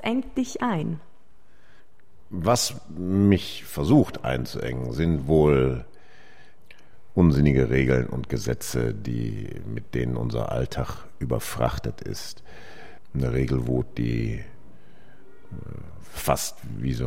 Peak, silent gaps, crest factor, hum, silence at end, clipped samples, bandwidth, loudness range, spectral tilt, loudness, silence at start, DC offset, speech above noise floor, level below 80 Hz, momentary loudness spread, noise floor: -6 dBFS; none; 20 dB; none; 0 s; under 0.1%; 16 kHz; 7 LU; -6 dB/octave; -25 LUFS; 0 s; 2%; 35 dB; -40 dBFS; 17 LU; -60 dBFS